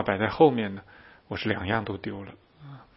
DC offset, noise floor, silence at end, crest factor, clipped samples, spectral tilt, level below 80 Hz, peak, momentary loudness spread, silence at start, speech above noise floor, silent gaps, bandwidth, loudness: under 0.1%; -48 dBFS; 0.15 s; 22 dB; under 0.1%; -10.5 dB/octave; -56 dBFS; -6 dBFS; 24 LU; 0 s; 21 dB; none; 5.8 kHz; -26 LUFS